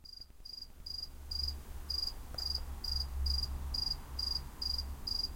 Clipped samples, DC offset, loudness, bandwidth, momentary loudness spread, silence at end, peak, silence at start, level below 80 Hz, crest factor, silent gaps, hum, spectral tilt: under 0.1%; under 0.1%; -38 LUFS; 16.5 kHz; 12 LU; 0 s; -22 dBFS; 0 s; -42 dBFS; 18 dB; none; none; -3 dB/octave